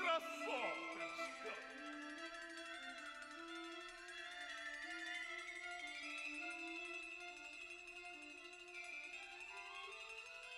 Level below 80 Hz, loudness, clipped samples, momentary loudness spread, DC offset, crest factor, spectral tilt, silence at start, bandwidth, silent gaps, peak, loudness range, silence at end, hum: -80 dBFS; -48 LUFS; under 0.1%; 8 LU; under 0.1%; 22 dB; -1 dB/octave; 0 s; 15 kHz; none; -28 dBFS; 3 LU; 0 s; none